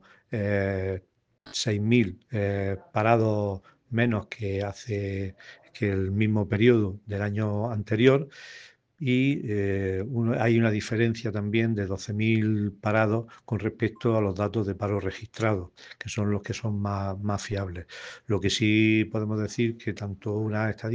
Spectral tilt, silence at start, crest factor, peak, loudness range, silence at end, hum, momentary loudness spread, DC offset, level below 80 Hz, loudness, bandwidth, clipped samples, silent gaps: -6.5 dB/octave; 0.3 s; 22 dB; -6 dBFS; 4 LU; 0 s; none; 11 LU; under 0.1%; -62 dBFS; -27 LUFS; 9 kHz; under 0.1%; none